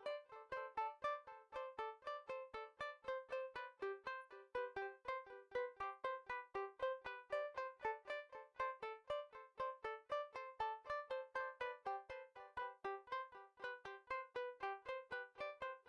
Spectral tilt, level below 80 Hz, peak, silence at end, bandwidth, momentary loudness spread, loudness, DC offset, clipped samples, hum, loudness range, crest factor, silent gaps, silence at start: -4 dB/octave; -80 dBFS; -32 dBFS; 0.1 s; 10.5 kHz; 6 LU; -48 LUFS; under 0.1%; under 0.1%; none; 2 LU; 18 dB; none; 0 s